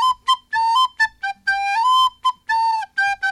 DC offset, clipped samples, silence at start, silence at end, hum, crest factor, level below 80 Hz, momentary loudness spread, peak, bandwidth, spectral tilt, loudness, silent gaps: under 0.1%; under 0.1%; 0 s; 0 s; none; 12 dB; -60 dBFS; 5 LU; -6 dBFS; 12.5 kHz; 2.5 dB/octave; -19 LUFS; none